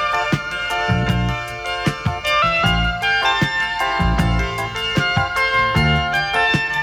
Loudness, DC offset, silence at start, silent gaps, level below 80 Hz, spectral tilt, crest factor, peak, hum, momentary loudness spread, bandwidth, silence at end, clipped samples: -18 LUFS; under 0.1%; 0 s; none; -30 dBFS; -5 dB/octave; 14 dB; -4 dBFS; none; 6 LU; 18 kHz; 0 s; under 0.1%